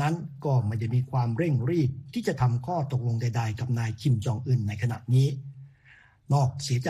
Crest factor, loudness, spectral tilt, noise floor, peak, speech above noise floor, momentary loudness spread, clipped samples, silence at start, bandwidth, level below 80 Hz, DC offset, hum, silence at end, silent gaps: 14 dB; -27 LUFS; -7 dB/octave; -57 dBFS; -12 dBFS; 31 dB; 5 LU; under 0.1%; 0 s; 11.5 kHz; -56 dBFS; under 0.1%; none; 0 s; none